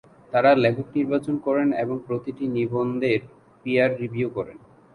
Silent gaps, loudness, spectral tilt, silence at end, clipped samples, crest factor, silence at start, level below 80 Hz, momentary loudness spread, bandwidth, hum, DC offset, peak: none; -23 LUFS; -8 dB/octave; 0.4 s; under 0.1%; 18 dB; 0.3 s; -62 dBFS; 10 LU; 10.5 kHz; none; under 0.1%; -4 dBFS